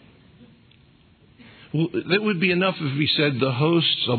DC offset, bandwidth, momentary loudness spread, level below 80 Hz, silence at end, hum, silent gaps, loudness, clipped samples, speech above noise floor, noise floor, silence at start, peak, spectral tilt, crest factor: under 0.1%; 4.6 kHz; 6 LU; -64 dBFS; 0 s; none; none; -21 LUFS; under 0.1%; 34 dB; -55 dBFS; 0.4 s; -6 dBFS; -9 dB/octave; 16 dB